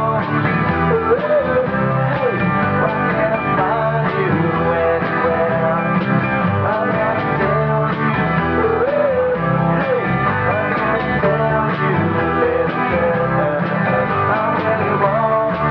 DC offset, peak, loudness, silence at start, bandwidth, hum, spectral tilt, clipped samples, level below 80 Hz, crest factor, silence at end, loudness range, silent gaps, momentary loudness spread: under 0.1%; -4 dBFS; -17 LUFS; 0 s; 5.6 kHz; none; -10 dB/octave; under 0.1%; -40 dBFS; 14 dB; 0 s; 0 LU; none; 1 LU